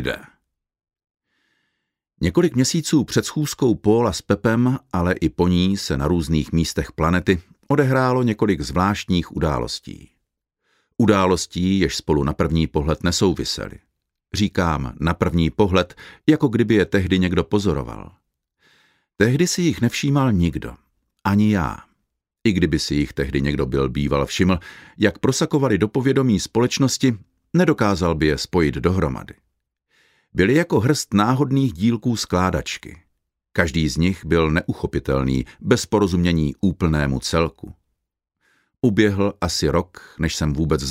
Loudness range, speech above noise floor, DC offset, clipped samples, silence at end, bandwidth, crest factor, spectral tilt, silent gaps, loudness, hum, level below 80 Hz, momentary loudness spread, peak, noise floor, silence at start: 3 LU; 59 dB; under 0.1%; under 0.1%; 0 s; 16 kHz; 18 dB; -5.5 dB/octave; none; -20 LUFS; none; -36 dBFS; 7 LU; -2 dBFS; -78 dBFS; 0 s